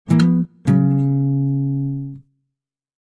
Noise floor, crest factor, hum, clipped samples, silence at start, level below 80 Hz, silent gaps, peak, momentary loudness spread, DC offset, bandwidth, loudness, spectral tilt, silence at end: -81 dBFS; 14 dB; none; under 0.1%; 0.05 s; -52 dBFS; none; -4 dBFS; 10 LU; under 0.1%; 10 kHz; -18 LUFS; -9 dB/octave; 0.85 s